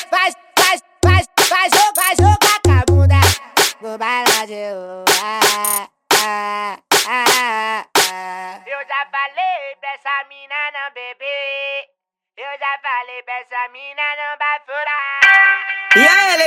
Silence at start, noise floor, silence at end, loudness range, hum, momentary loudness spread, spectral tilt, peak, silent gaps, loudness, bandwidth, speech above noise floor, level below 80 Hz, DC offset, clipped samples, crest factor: 0 s; -70 dBFS; 0 s; 11 LU; none; 15 LU; -3 dB/octave; 0 dBFS; none; -15 LUFS; 17 kHz; 56 dB; -42 dBFS; under 0.1%; under 0.1%; 16 dB